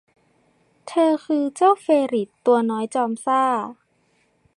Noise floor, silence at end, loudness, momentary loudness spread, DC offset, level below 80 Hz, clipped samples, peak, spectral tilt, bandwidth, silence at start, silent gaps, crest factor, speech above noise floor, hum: -64 dBFS; 0.85 s; -20 LUFS; 6 LU; under 0.1%; -78 dBFS; under 0.1%; -6 dBFS; -5 dB/octave; 11.5 kHz; 0.85 s; none; 16 dB; 44 dB; none